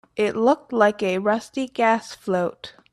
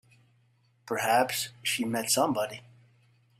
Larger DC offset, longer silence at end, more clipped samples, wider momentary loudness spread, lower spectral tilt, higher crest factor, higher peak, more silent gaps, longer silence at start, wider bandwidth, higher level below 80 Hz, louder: neither; second, 0.2 s vs 0.8 s; neither; about the same, 8 LU vs 10 LU; first, -5.5 dB/octave vs -2.5 dB/octave; about the same, 18 dB vs 20 dB; first, -4 dBFS vs -12 dBFS; neither; second, 0.15 s vs 0.85 s; second, 13 kHz vs 16 kHz; first, -66 dBFS vs -72 dBFS; first, -22 LUFS vs -28 LUFS